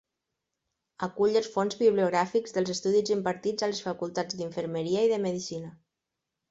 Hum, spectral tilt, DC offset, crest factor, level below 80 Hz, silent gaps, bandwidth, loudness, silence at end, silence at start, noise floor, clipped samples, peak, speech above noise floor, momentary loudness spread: none; -5 dB/octave; under 0.1%; 18 dB; -70 dBFS; none; 8 kHz; -28 LUFS; 0.8 s; 1 s; -86 dBFS; under 0.1%; -10 dBFS; 58 dB; 10 LU